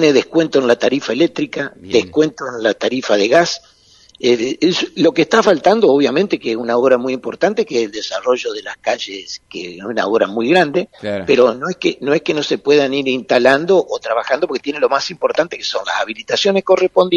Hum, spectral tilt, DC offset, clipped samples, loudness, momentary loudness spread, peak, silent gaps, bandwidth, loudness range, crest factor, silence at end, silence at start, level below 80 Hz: none; -4.5 dB/octave; under 0.1%; under 0.1%; -16 LUFS; 9 LU; 0 dBFS; none; 9.4 kHz; 4 LU; 16 dB; 0 s; 0 s; -58 dBFS